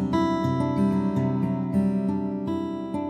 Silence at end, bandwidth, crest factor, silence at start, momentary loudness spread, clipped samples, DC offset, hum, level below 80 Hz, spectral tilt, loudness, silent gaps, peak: 0 s; 9.4 kHz; 16 dB; 0 s; 5 LU; under 0.1%; under 0.1%; none; -58 dBFS; -8.5 dB/octave; -25 LUFS; none; -10 dBFS